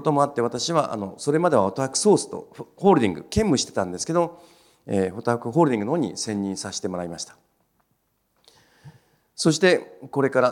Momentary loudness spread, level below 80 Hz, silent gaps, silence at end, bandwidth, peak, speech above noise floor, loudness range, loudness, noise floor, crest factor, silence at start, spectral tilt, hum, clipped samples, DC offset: 11 LU; -52 dBFS; none; 0 s; 16 kHz; -4 dBFS; 48 dB; 8 LU; -23 LUFS; -70 dBFS; 20 dB; 0 s; -5 dB/octave; none; under 0.1%; under 0.1%